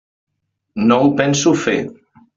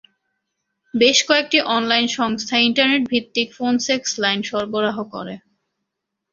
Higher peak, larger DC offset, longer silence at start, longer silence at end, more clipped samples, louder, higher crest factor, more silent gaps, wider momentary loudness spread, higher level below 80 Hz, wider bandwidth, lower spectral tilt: about the same, -2 dBFS vs -2 dBFS; neither; second, 0.75 s vs 0.95 s; second, 0.45 s vs 0.95 s; neither; first, -15 LUFS vs -18 LUFS; about the same, 16 dB vs 20 dB; neither; about the same, 14 LU vs 13 LU; first, -56 dBFS vs -64 dBFS; about the same, 7.8 kHz vs 7.6 kHz; first, -5 dB/octave vs -2.5 dB/octave